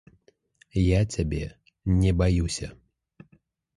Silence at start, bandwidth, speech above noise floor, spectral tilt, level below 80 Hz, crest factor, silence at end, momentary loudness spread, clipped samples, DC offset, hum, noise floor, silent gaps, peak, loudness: 0.75 s; 11.5 kHz; 40 dB; -6.5 dB/octave; -34 dBFS; 18 dB; 1.05 s; 13 LU; under 0.1%; under 0.1%; none; -63 dBFS; none; -10 dBFS; -26 LUFS